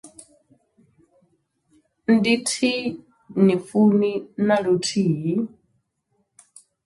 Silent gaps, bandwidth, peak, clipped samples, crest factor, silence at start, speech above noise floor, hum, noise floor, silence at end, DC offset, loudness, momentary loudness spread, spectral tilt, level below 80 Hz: none; 11.5 kHz; -4 dBFS; under 0.1%; 18 dB; 0.05 s; 51 dB; none; -71 dBFS; 1.4 s; under 0.1%; -21 LUFS; 13 LU; -5.5 dB/octave; -66 dBFS